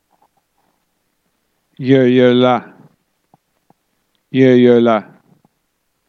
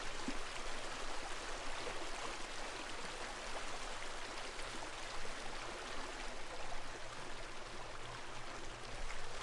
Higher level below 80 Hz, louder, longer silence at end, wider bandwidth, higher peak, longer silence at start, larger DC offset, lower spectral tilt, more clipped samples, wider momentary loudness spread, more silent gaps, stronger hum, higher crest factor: second, -70 dBFS vs -50 dBFS; first, -12 LUFS vs -46 LUFS; first, 1.05 s vs 0 s; second, 6.6 kHz vs 11.5 kHz; first, 0 dBFS vs -30 dBFS; first, 1.8 s vs 0 s; neither; first, -8 dB/octave vs -2 dB/octave; neither; first, 10 LU vs 4 LU; neither; neither; about the same, 16 dB vs 14 dB